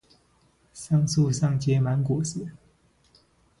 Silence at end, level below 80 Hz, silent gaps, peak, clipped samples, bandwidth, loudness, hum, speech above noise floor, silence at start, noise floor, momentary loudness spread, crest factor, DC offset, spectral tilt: 1.05 s; -56 dBFS; none; -12 dBFS; under 0.1%; 11.5 kHz; -25 LUFS; none; 40 dB; 0.75 s; -63 dBFS; 14 LU; 14 dB; under 0.1%; -6.5 dB/octave